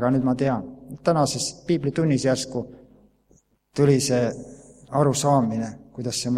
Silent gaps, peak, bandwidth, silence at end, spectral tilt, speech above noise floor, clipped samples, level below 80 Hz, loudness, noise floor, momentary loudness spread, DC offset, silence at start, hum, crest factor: none; -6 dBFS; 15 kHz; 0 s; -5.5 dB/octave; 39 dB; under 0.1%; -56 dBFS; -23 LUFS; -61 dBFS; 14 LU; under 0.1%; 0 s; none; 18 dB